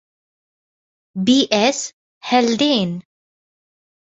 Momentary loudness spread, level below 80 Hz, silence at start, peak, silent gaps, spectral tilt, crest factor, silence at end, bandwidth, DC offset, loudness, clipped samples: 17 LU; -62 dBFS; 1.15 s; -2 dBFS; 1.93-2.21 s; -4 dB/octave; 18 dB; 1.15 s; 8 kHz; under 0.1%; -17 LUFS; under 0.1%